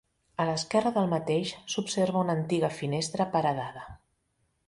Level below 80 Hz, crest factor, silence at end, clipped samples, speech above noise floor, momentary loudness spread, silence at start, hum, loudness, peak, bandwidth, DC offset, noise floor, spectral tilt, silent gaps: -62 dBFS; 18 dB; 0.7 s; under 0.1%; 46 dB; 9 LU; 0.4 s; none; -29 LUFS; -12 dBFS; 11.5 kHz; under 0.1%; -75 dBFS; -5 dB/octave; none